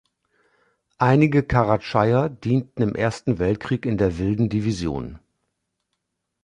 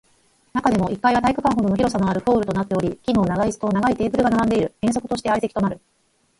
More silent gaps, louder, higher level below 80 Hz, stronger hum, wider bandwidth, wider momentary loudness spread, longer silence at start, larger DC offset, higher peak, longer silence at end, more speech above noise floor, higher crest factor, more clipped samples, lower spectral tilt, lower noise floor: neither; about the same, -22 LUFS vs -21 LUFS; about the same, -44 dBFS vs -44 dBFS; neither; about the same, 10.5 kHz vs 11.5 kHz; about the same, 7 LU vs 5 LU; first, 1 s vs 0.55 s; neither; about the same, -2 dBFS vs -4 dBFS; first, 1.25 s vs 0.65 s; first, 57 dB vs 40 dB; about the same, 20 dB vs 16 dB; neither; first, -8 dB/octave vs -6.5 dB/octave; first, -78 dBFS vs -60 dBFS